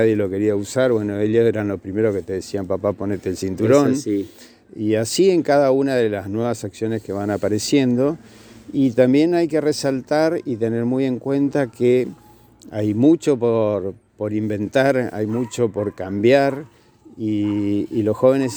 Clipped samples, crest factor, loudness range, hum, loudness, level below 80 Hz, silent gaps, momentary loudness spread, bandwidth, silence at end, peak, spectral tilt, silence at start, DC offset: under 0.1%; 18 dB; 2 LU; none; -20 LUFS; -58 dBFS; none; 10 LU; over 20 kHz; 0 s; -2 dBFS; -6 dB/octave; 0 s; under 0.1%